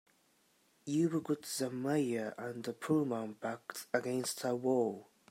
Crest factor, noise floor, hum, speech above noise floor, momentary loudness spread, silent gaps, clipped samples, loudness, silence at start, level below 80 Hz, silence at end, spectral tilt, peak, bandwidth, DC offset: 20 dB; -72 dBFS; none; 36 dB; 9 LU; none; under 0.1%; -36 LUFS; 0.85 s; -82 dBFS; 0.3 s; -5 dB/octave; -16 dBFS; 16 kHz; under 0.1%